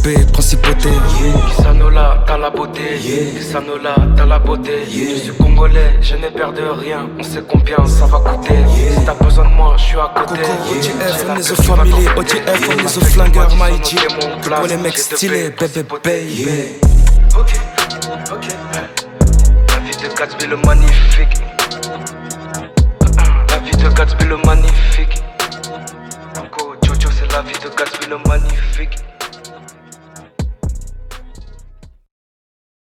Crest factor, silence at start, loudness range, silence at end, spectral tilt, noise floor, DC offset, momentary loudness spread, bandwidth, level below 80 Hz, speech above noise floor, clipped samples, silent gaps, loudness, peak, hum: 12 dB; 0 s; 7 LU; 1.3 s; -5 dB/octave; -38 dBFS; under 0.1%; 13 LU; 16 kHz; -12 dBFS; 28 dB; under 0.1%; none; -14 LUFS; 0 dBFS; none